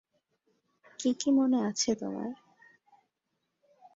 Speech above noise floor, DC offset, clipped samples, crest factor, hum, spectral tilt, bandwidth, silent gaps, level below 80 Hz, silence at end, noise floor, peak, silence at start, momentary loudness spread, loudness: 54 dB; under 0.1%; under 0.1%; 18 dB; none; -4 dB/octave; 8 kHz; none; -74 dBFS; 1.6 s; -82 dBFS; -14 dBFS; 1 s; 14 LU; -30 LUFS